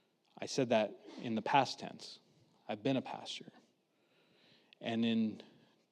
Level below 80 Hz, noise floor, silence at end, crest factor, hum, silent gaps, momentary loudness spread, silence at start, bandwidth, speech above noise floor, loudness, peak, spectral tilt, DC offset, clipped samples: under -90 dBFS; -75 dBFS; 0.45 s; 24 dB; none; none; 18 LU; 0.4 s; 10 kHz; 39 dB; -37 LUFS; -14 dBFS; -5 dB/octave; under 0.1%; under 0.1%